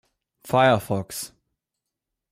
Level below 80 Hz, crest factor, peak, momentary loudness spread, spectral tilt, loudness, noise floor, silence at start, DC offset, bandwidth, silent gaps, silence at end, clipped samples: -62 dBFS; 18 dB; -8 dBFS; 15 LU; -5 dB/octave; -22 LUFS; -84 dBFS; 0.45 s; under 0.1%; 16 kHz; none; 1.05 s; under 0.1%